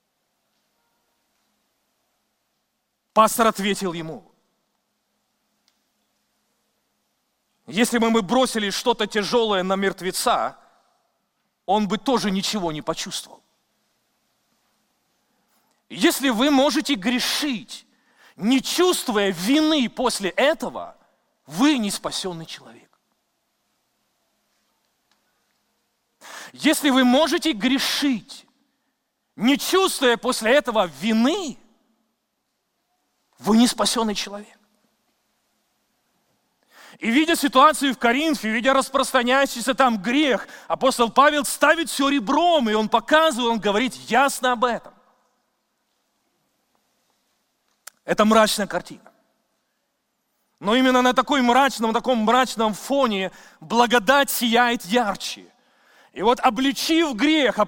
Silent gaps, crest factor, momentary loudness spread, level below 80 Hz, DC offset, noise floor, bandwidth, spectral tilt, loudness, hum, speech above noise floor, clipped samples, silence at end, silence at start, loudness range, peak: none; 20 dB; 13 LU; -56 dBFS; under 0.1%; -75 dBFS; 17 kHz; -3.5 dB/octave; -20 LUFS; none; 55 dB; under 0.1%; 0 s; 3.15 s; 8 LU; -2 dBFS